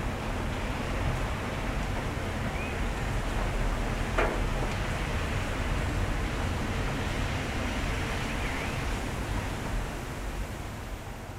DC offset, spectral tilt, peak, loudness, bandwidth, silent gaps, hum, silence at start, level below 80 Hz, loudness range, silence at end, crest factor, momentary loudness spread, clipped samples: under 0.1%; -5 dB/octave; -12 dBFS; -32 LUFS; 16 kHz; none; none; 0 s; -34 dBFS; 2 LU; 0 s; 20 dB; 5 LU; under 0.1%